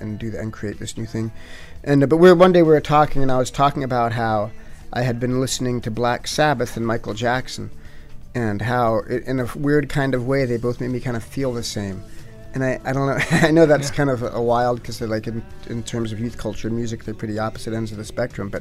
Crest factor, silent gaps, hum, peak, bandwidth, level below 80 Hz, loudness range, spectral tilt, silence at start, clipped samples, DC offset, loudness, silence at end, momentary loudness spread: 18 dB; none; none; -2 dBFS; 15 kHz; -38 dBFS; 8 LU; -6 dB/octave; 0 s; under 0.1%; under 0.1%; -20 LUFS; 0 s; 15 LU